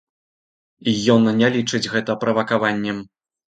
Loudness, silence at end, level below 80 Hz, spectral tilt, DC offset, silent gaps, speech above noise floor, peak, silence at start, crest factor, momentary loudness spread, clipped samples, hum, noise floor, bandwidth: -19 LUFS; 0.5 s; -60 dBFS; -5 dB/octave; under 0.1%; none; over 71 dB; -2 dBFS; 0.85 s; 18 dB; 10 LU; under 0.1%; none; under -90 dBFS; 9.2 kHz